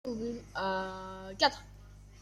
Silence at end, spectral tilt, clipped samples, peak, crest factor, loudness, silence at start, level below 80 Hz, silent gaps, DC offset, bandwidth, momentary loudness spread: 0 s; -3.5 dB/octave; under 0.1%; -14 dBFS; 22 dB; -34 LUFS; 0.05 s; -56 dBFS; none; under 0.1%; 14.5 kHz; 16 LU